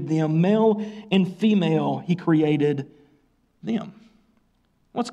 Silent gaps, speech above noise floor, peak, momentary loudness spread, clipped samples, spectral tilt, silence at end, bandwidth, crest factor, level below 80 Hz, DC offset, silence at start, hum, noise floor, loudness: none; 44 dB; -8 dBFS; 13 LU; under 0.1%; -8 dB/octave; 0 s; 10 kHz; 16 dB; -68 dBFS; under 0.1%; 0 s; none; -65 dBFS; -22 LUFS